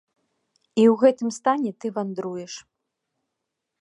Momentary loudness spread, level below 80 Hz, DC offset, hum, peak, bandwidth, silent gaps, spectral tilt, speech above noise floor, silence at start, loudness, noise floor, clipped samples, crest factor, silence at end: 17 LU; -74 dBFS; under 0.1%; none; -4 dBFS; 10.5 kHz; none; -5.5 dB/octave; 60 dB; 0.75 s; -22 LUFS; -82 dBFS; under 0.1%; 20 dB; 1.2 s